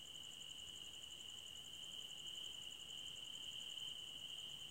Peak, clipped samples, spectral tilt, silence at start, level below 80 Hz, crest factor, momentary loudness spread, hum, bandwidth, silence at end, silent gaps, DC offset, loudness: -38 dBFS; under 0.1%; 0 dB/octave; 0 s; -78 dBFS; 14 dB; 4 LU; none; 16 kHz; 0 s; none; under 0.1%; -50 LUFS